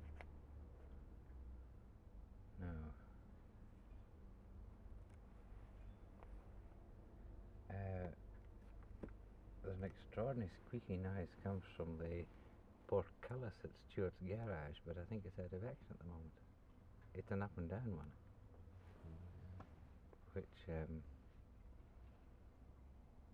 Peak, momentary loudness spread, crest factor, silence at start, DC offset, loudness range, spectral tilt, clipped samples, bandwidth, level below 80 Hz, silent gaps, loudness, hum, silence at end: -28 dBFS; 18 LU; 24 dB; 0 s; under 0.1%; 12 LU; -9 dB/octave; under 0.1%; 6.6 kHz; -60 dBFS; none; -52 LUFS; none; 0 s